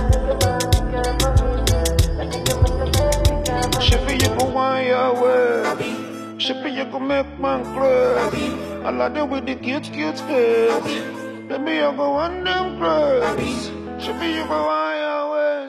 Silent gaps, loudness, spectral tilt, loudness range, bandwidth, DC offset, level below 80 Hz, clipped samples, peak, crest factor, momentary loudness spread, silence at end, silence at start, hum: none; -20 LUFS; -5 dB/octave; 3 LU; 15 kHz; under 0.1%; -28 dBFS; under 0.1%; -2 dBFS; 18 dB; 8 LU; 0 s; 0 s; none